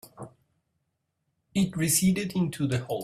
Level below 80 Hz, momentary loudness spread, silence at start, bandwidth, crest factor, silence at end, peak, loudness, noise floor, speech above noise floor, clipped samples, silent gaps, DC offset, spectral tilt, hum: -58 dBFS; 23 LU; 0.05 s; 16 kHz; 18 dB; 0 s; -12 dBFS; -26 LUFS; -79 dBFS; 53 dB; under 0.1%; none; under 0.1%; -4.5 dB/octave; none